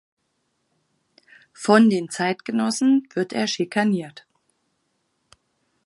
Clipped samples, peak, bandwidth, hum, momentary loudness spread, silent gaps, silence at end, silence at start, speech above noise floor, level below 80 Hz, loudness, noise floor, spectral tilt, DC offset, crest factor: under 0.1%; -2 dBFS; 11.5 kHz; none; 11 LU; none; 1.75 s; 1.6 s; 52 dB; -76 dBFS; -21 LUFS; -72 dBFS; -5 dB/octave; under 0.1%; 22 dB